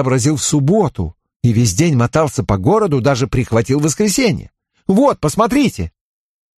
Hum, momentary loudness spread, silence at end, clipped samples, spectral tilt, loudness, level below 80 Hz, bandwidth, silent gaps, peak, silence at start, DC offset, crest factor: none; 8 LU; 0.7 s; under 0.1%; -5.5 dB/octave; -15 LUFS; -36 dBFS; 13 kHz; 1.36-1.40 s; 0 dBFS; 0 s; under 0.1%; 14 dB